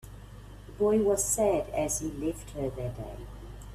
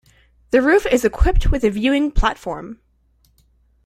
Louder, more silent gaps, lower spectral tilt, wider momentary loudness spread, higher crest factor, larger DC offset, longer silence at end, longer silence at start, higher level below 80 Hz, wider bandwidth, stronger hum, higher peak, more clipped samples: second, -29 LUFS vs -18 LUFS; neither; about the same, -5 dB/octave vs -6 dB/octave; first, 23 LU vs 14 LU; about the same, 16 dB vs 16 dB; neither; second, 0 s vs 1.1 s; second, 0.05 s vs 0.55 s; second, -46 dBFS vs -24 dBFS; about the same, 15.5 kHz vs 15 kHz; first, 50 Hz at -45 dBFS vs none; second, -14 dBFS vs -2 dBFS; neither